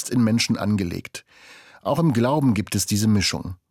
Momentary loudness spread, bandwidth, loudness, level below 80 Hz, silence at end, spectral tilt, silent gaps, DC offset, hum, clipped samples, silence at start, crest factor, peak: 12 LU; 17 kHz; -21 LUFS; -54 dBFS; 0.15 s; -5 dB/octave; none; under 0.1%; none; under 0.1%; 0 s; 14 dB; -8 dBFS